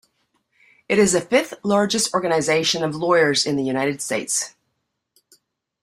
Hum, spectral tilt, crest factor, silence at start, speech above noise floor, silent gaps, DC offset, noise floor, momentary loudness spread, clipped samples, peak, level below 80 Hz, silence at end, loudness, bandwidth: none; -3 dB/octave; 18 dB; 0.9 s; 55 dB; none; under 0.1%; -75 dBFS; 6 LU; under 0.1%; -4 dBFS; -60 dBFS; 1.35 s; -20 LUFS; 15.5 kHz